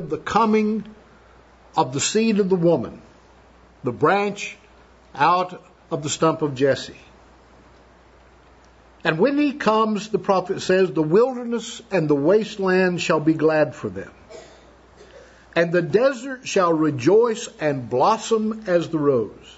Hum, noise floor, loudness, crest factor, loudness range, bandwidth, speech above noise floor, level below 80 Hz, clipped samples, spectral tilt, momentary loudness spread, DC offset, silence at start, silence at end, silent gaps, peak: none; -51 dBFS; -21 LUFS; 18 dB; 4 LU; 8 kHz; 31 dB; -56 dBFS; under 0.1%; -5.5 dB/octave; 11 LU; under 0.1%; 0 s; 0.05 s; none; -4 dBFS